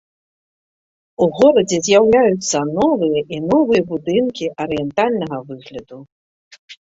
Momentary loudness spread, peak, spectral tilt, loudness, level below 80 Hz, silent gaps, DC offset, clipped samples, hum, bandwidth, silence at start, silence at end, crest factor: 17 LU; 0 dBFS; -4.5 dB/octave; -16 LUFS; -54 dBFS; 6.12-6.51 s, 6.59-6.68 s; under 0.1%; under 0.1%; none; 8 kHz; 1.2 s; 0.2 s; 16 dB